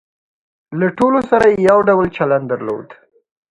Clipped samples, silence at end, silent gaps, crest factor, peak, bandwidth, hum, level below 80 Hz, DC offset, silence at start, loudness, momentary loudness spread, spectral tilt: under 0.1%; 0.6 s; none; 16 dB; 0 dBFS; 11 kHz; none; -48 dBFS; under 0.1%; 0.7 s; -14 LUFS; 13 LU; -7.5 dB/octave